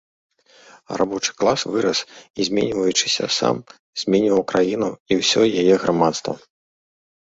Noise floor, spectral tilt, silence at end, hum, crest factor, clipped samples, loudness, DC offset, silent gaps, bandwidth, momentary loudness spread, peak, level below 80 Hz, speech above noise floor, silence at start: -50 dBFS; -3.5 dB/octave; 1 s; none; 18 dB; under 0.1%; -20 LUFS; under 0.1%; 2.30-2.34 s, 3.79-3.93 s, 5.00-5.06 s; 8 kHz; 11 LU; -2 dBFS; -58 dBFS; 30 dB; 0.9 s